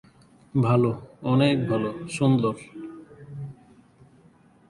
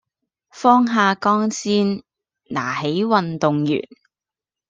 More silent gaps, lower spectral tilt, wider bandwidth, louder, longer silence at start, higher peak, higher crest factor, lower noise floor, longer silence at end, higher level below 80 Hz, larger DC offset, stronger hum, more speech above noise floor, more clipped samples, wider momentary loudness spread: neither; first, -7.5 dB/octave vs -5.5 dB/octave; first, 11.5 kHz vs 9 kHz; second, -24 LUFS vs -19 LUFS; about the same, 0.55 s vs 0.55 s; second, -8 dBFS vs -2 dBFS; about the same, 18 dB vs 18 dB; second, -56 dBFS vs -89 dBFS; first, 1.15 s vs 0.85 s; about the same, -60 dBFS vs -64 dBFS; neither; neither; second, 33 dB vs 71 dB; neither; first, 20 LU vs 10 LU